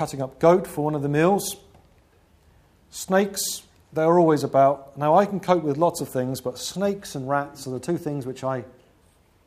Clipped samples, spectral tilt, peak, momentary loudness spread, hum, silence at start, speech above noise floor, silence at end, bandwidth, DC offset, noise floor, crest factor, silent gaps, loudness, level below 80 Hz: under 0.1%; -5.5 dB/octave; -4 dBFS; 13 LU; none; 0 s; 37 dB; 0.8 s; 15.5 kHz; under 0.1%; -59 dBFS; 20 dB; none; -23 LUFS; -58 dBFS